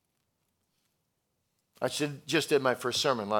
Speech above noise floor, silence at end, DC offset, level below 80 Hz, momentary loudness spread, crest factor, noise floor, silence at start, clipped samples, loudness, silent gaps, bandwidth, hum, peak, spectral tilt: 50 dB; 0 s; under 0.1%; -80 dBFS; 7 LU; 22 dB; -79 dBFS; 1.8 s; under 0.1%; -29 LUFS; none; 18.5 kHz; none; -12 dBFS; -3.5 dB/octave